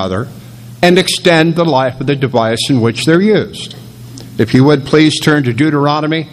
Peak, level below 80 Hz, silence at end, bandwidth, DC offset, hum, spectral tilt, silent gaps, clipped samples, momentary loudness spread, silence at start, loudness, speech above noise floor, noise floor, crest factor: 0 dBFS; -46 dBFS; 0.05 s; 14.5 kHz; under 0.1%; none; -5.5 dB/octave; none; 0.3%; 17 LU; 0 s; -11 LUFS; 20 dB; -31 dBFS; 12 dB